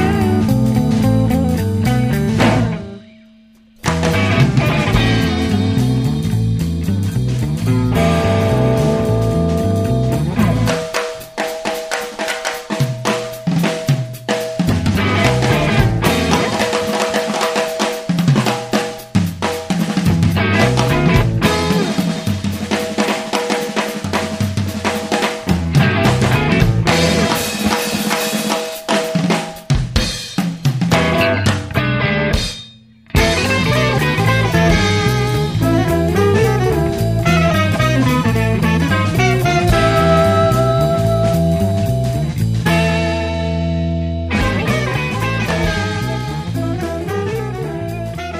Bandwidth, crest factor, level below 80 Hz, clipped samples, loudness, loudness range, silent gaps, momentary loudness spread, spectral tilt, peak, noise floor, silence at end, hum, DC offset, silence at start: 15.5 kHz; 16 dB; -30 dBFS; under 0.1%; -16 LUFS; 4 LU; none; 7 LU; -5.5 dB/octave; 0 dBFS; -47 dBFS; 0 s; none; under 0.1%; 0 s